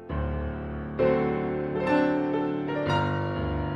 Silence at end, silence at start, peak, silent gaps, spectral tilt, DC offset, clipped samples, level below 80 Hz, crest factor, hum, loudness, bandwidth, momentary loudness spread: 0 s; 0 s; -10 dBFS; none; -8 dB/octave; under 0.1%; under 0.1%; -40 dBFS; 16 dB; none; -27 LUFS; 7.8 kHz; 8 LU